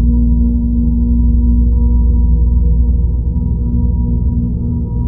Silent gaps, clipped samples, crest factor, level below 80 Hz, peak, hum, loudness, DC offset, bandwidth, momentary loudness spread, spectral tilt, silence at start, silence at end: none; under 0.1%; 10 dB; -12 dBFS; -2 dBFS; 60 Hz at -30 dBFS; -14 LUFS; under 0.1%; 1 kHz; 4 LU; -16.5 dB/octave; 0 s; 0 s